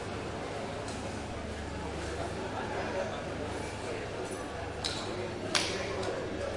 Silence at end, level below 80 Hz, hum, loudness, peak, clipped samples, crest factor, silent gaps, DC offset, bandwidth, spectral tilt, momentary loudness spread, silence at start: 0 s; -50 dBFS; none; -36 LUFS; -10 dBFS; under 0.1%; 26 dB; none; under 0.1%; 11.5 kHz; -4 dB/octave; 7 LU; 0 s